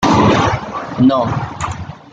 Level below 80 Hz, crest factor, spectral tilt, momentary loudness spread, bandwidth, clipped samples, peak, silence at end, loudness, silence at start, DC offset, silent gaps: -38 dBFS; 14 dB; -6 dB/octave; 13 LU; 9.2 kHz; under 0.1%; -2 dBFS; 0.15 s; -15 LUFS; 0 s; under 0.1%; none